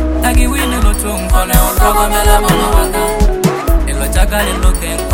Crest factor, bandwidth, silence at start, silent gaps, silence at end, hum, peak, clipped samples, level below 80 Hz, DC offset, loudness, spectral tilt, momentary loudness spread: 10 dB; 17.5 kHz; 0 s; none; 0 s; none; 0 dBFS; under 0.1%; -14 dBFS; under 0.1%; -13 LUFS; -4.5 dB/octave; 4 LU